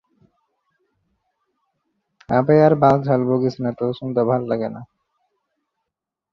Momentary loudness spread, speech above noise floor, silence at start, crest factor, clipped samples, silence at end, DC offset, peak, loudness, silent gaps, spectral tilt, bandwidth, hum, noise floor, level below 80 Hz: 11 LU; 65 dB; 2.3 s; 20 dB; under 0.1%; 1.5 s; under 0.1%; -2 dBFS; -18 LUFS; none; -9.5 dB/octave; 6.8 kHz; none; -83 dBFS; -58 dBFS